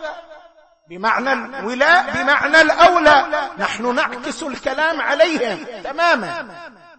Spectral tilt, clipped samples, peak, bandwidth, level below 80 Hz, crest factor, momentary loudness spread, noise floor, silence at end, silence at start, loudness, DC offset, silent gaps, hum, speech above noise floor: -3 dB/octave; under 0.1%; -2 dBFS; 8.8 kHz; -50 dBFS; 16 dB; 16 LU; -49 dBFS; 0.3 s; 0 s; -16 LUFS; under 0.1%; none; none; 32 dB